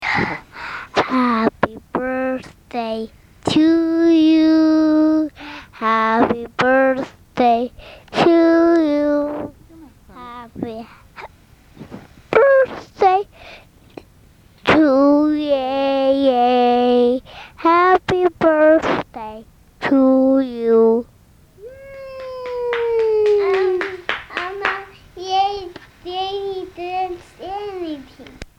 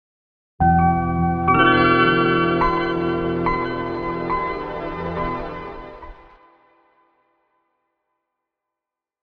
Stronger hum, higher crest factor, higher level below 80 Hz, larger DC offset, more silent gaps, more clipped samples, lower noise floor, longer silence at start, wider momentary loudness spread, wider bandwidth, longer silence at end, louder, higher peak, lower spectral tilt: neither; about the same, 18 dB vs 20 dB; second, -50 dBFS vs -38 dBFS; neither; neither; neither; second, -49 dBFS vs -87 dBFS; second, 0 s vs 0.6 s; first, 19 LU vs 15 LU; first, 9.2 kHz vs 5.2 kHz; second, 0.15 s vs 3.1 s; about the same, -17 LUFS vs -19 LUFS; about the same, 0 dBFS vs -2 dBFS; second, -6 dB/octave vs -8.5 dB/octave